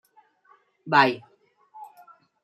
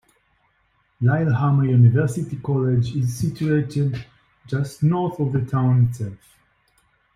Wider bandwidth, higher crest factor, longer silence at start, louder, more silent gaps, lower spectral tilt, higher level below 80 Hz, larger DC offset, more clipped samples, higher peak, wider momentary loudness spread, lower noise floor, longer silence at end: first, 14 kHz vs 12 kHz; first, 24 dB vs 16 dB; second, 0.85 s vs 1 s; about the same, -21 LUFS vs -21 LUFS; neither; second, -5.5 dB/octave vs -8.5 dB/octave; second, -78 dBFS vs -52 dBFS; neither; neither; about the same, -4 dBFS vs -6 dBFS; first, 27 LU vs 10 LU; second, -61 dBFS vs -65 dBFS; second, 0.6 s vs 1 s